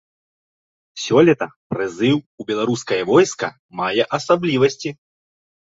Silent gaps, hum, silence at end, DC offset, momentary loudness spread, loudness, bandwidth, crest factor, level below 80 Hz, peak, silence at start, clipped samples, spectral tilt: 1.56-1.70 s, 2.26-2.38 s, 3.59-3.69 s; none; 0.85 s; under 0.1%; 12 LU; -19 LUFS; 8 kHz; 18 dB; -60 dBFS; -2 dBFS; 0.95 s; under 0.1%; -5 dB/octave